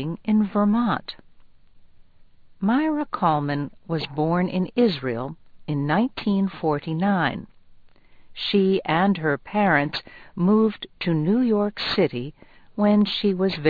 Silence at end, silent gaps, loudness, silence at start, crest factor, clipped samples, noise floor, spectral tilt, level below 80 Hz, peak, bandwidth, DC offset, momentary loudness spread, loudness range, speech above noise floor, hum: 0 s; none; -23 LUFS; 0 s; 18 dB; under 0.1%; -49 dBFS; -8.5 dB/octave; -54 dBFS; -6 dBFS; 4.9 kHz; under 0.1%; 10 LU; 3 LU; 27 dB; none